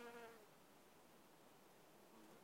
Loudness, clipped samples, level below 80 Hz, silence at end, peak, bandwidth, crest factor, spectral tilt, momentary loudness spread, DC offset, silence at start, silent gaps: -65 LUFS; under 0.1%; under -90 dBFS; 0 s; -46 dBFS; 16 kHz; 20 dB; -3.5 dB/octave; 8 LU; under 0.1%; 0 s; none